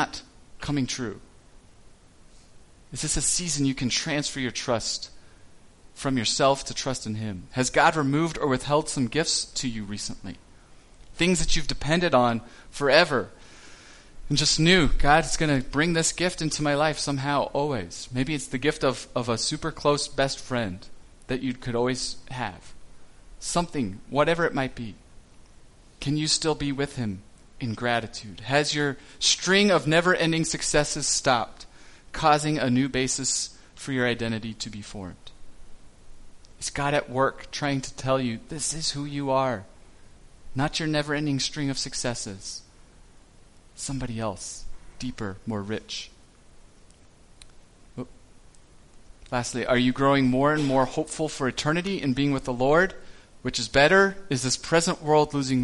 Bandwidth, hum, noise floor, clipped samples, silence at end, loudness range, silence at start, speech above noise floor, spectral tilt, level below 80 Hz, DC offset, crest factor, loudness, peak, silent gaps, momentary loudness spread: 11.5 kHz; none; -52 dBFS; under 0.1%; 0 s; 10 LU; 0 s; 28 dB; -4 dB/octave; -42 dBFS; under 0.1%; 22 dB; -25 LUFS; -4 dBFS; none; 15 LU